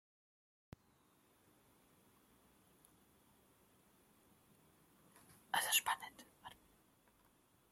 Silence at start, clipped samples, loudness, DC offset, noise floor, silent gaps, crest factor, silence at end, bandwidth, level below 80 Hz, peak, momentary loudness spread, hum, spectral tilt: 5.55 s; under 0.1%; -37 LUFS; under 0.1%; -74 dBFS; none; 30 dB; 1.2 s; 16.5 kHz; -82 dBFS; -18 dBFS; 25 LU; none; 1 dB/octave